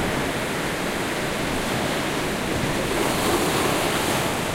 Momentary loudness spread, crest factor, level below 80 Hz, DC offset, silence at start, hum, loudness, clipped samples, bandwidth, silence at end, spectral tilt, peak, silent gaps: 4 LU; 16 dB; -40 dBFS; under 0.1%; 0 s; none; -23 LUFS; under 0.1%; 16 kHz; 0 s; -3.5 dB/octave; -8 dBFS; none